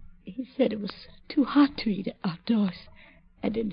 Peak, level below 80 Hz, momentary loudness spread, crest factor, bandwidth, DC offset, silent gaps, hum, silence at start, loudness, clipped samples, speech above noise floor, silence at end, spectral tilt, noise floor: -12 dBFS; -54 dBFS; 17 LU; 18 dB; 5.2 kHz; under 0.1%; none; none; 0 s; -28 LUFS; under 0.1%; 27 dB; 0 s; -10.5 dB/octave; -54 dBFS